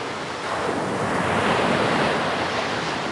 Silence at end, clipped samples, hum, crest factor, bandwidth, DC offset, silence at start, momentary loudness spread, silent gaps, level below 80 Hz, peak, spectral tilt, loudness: 0 s; under 0.1%; none; 16 dB; 11.5 kHz; under 0.1%; 0 s; 6 LU; none; -54 dBFS; -8 dBFS; -4.5 dB/octave; -23 LUFS